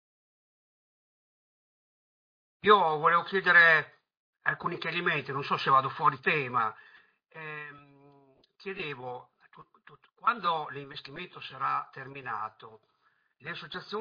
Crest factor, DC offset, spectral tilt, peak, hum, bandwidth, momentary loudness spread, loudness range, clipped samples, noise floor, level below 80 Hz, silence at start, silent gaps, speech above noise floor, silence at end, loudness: 24 dB; under 0.1%; -6 dB/octave; -8 dBFS; none; 5.2 kHz; 20 LU; 13 LU; under 0.1%; -72 dBFS; -76 dBFS; 2.65 s; 4.17-4.33 s; 43 dB; 0 s; -27 LUFS